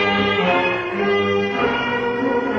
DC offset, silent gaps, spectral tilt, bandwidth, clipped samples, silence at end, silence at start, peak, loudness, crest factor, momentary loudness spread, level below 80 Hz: under 0.1%; none; -6 dB/octave; 7.2 kHz; under 0.1%; 0 s; 0 s; -6 dBFS; -19 LUFS; 14 dB; 3 LU; -50 dBFS